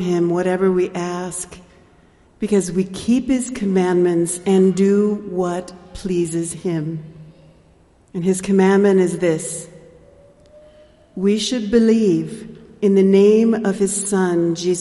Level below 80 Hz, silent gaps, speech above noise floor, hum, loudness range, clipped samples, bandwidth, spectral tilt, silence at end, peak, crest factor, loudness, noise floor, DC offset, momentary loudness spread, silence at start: -50 dBFS; none; 35 dB; none; 5 LU; under 0.1%; 11.5 kHz; -6 dB/octave; 0 s; -2 dBFS; 16 dB; -18 LUFS; -52 dBFS; under 0.1%; 15 LU; 0 s